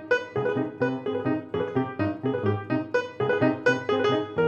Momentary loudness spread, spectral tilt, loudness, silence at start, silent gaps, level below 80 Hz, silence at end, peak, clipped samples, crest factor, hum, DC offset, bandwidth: 5 LU; -7 dB/octave; -26 LUFS; 0 s; none; -70 dBFS; 0 s; -10 dBFS; under 0.1%; 16 dB; none; under 0.1%; 8 kHz